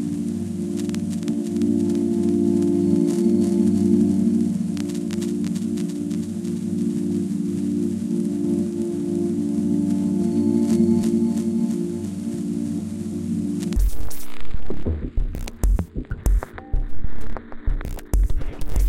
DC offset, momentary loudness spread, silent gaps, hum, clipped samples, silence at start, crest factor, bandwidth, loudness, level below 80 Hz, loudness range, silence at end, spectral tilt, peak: under 0.1%; 12 LU; none; none; under 0.1%; 0 s; 14 dB; 16.5 kHz; -23 LUFS; -30 dBFS; 8 LU; 0 s; -7.5 dB/octave; -6 dBFS